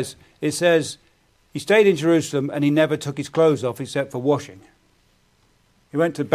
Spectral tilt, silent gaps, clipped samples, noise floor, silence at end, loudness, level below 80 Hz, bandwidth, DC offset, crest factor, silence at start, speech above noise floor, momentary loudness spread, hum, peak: -5.5 dB/octave; none; under 0.1%; -61 dBFS; 0 s; -21 LUFS; -62 dBFS; 15.5 kHz; under 0.1%; 20 dB; 0 s; 40 dB; 15 LU; none; -2 dBFS